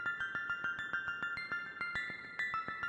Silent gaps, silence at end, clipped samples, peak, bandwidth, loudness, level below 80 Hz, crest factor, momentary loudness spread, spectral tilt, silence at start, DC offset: none; 0 s; under 0.1%; -22 dBFS; 9.4 kHz; -38 LUFS; -70 dBFS; 16 dB; 2 LU; -3 dB/octave; 0 s; under 0.1%